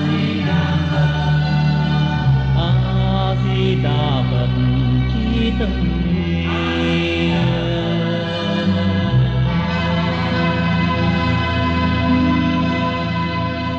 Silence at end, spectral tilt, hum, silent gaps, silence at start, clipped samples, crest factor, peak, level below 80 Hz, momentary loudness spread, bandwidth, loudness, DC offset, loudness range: 0 s; -7.5 dB/octave; none; none; 0 s; under 0.1%; 12 dB; -4 dBFS; -28 dBFS; 3 LU; 7.2 kHz; -18 LUFS; under 0.1%; 1 LU